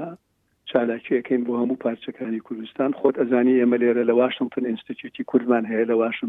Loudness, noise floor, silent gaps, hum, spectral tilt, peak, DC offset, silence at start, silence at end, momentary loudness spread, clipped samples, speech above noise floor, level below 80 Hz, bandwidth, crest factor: -22 LUFS; -68 dBFS; none; none; -8.5 dB/octave; -4 dBFS; under 0.1%; 0 s; 0 s; 13 LU; under 0.1%; 46 dB; -72 dBFS; 3.9 kHz; 18 dB